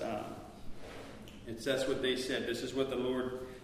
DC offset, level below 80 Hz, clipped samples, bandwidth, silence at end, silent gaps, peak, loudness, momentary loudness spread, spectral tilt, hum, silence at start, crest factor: under 0.1%; -56 dBFS; under 0.1%; 15.5 kHz; 0 s; none; -18 dBFS; -36 LUFS; 16 LU; -4.5 dB/octave; none; 0 s; 18 dB